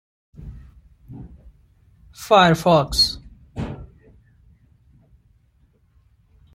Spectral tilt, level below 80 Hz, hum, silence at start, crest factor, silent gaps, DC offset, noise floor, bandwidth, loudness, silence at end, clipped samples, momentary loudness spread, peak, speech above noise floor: -4.5 dB/octave; -44 dBFS; none; 0.4 s; 22 dB; none; under 0.1%; -59 dBFS; 16 kHz; -18 LUFS; 2.7 s; under 0.1%; 27 LU; -2 dBFS; 43 dB